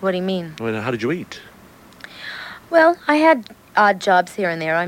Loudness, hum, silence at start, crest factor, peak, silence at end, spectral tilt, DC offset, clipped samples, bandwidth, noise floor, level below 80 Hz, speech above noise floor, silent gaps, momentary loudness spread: -18 LUFS; none; 0 s; 18 dB; 0 dBFS; 0 s; -5.5 dB/octave; under 0.1%; under 0.1%; 16.5 kHz; -45 dBFS; -60 dBFS; 27 dB; none; 18 LU